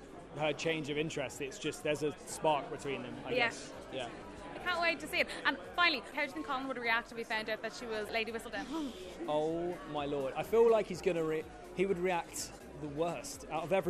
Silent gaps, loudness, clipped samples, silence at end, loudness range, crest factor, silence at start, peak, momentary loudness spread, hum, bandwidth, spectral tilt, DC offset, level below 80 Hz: none; -35 LUFS; under 0.1%; 0 s; 3 LU; 20 dB; 0 s; -14 dBFS; 12 LU; none; 13.5 kHz; -4 dB/octave; under 0.1%; -62 dBFS